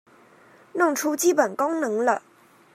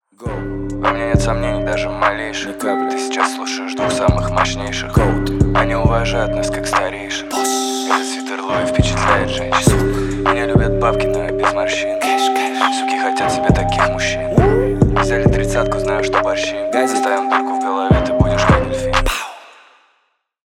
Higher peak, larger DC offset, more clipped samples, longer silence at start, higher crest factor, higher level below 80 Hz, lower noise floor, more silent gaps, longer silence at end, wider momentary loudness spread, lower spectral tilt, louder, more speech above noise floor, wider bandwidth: second, -6 dBFS vs 0 dBFS; neither; neither; first, 0.75 s vs 0.2 s; about the same, 20 dB vs 16 dB; second, -82 dBFS vs -26 dBFS; second, -53 dBFS vs -64 dBFS; neither; second, 0.55 s vs 1 s; about the same, 5 LU vs 6 LU; second, -3 dB/octave vs -5 dB/octave; second, -23 LUFS vs -17 LUFS; second, 31 dB vs 48 dB; about the same, 15.5 kHz vs 16.5 kHz